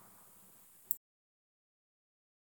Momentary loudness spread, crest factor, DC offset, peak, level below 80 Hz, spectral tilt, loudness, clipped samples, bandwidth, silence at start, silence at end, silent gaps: 19 LU; 42 dB; under 0.1%; -10 dBFS; under -90 dBFS; -1.5 dB/octave; -39 LUFS; under 0.1%; 19 kHz; 0 s; 1.55 s; none